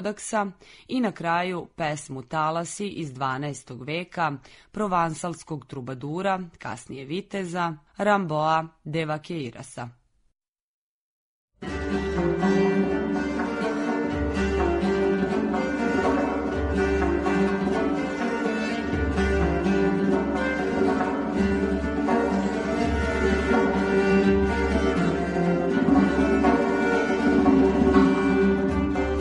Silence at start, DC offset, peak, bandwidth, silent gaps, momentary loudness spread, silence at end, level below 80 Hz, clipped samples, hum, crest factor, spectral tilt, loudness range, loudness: 0 s; under 0.1%; -6 dBFS; 10.5 kHz; 10.48-10.53 s, 10.61-11.48 s; 12 LU; 0 s; -38 dBFS; under 0.1%; none; 18 dB; -6.5 dB/octave; 8 LU; -24 LUFS